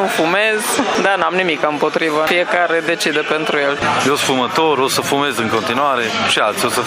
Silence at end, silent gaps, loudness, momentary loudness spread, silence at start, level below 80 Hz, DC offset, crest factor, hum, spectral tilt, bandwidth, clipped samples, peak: 0 s; none; -15 LUFS; 2 LU; 0 s; -56 dBFS; under 0.1%; 16 dB; none; -3 dB/octave; 15.5 kHz; under 0.1%; 0 dBFS